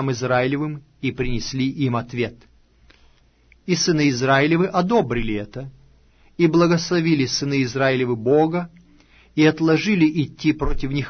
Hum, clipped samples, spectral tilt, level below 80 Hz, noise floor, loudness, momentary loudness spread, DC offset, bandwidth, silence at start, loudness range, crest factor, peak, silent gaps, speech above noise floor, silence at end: none; under 0.1%; -5.5 dB/octave; -36 dBFS; -55 dBFS; -20 LUFS; 11 LU; under 0.1%; 6.6 kHz; 0 s; 5 LU; 16 dB; -4 dBFS; none; 36 dB; 0 s